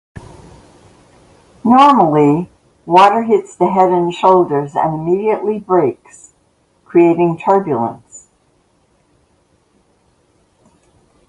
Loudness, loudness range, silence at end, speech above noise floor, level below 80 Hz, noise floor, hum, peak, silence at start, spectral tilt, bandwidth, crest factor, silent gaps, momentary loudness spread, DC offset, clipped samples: -13 LUFS; 7 LU; 3.1 s; 45 dB; -54 dBFS; -57 dBFS; none; 0 dBFS; 0.15 s; -7 dB/octave; 11 kHz; 16 dB; none; 10 LU; under 0.1%; under 0.1%